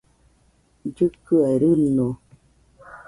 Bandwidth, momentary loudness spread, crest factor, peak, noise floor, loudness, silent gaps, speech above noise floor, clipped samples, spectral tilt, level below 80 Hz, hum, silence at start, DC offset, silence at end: 11.5 kHz; 17 LU; 16 dB; -8 dBFS; -61 dBFS; -20 LUFS; none; 41 dB; under 0.1%; -9.5 dB/octave; -54 dBFS; none; 0.85 s; under 0.1%; 0.1 s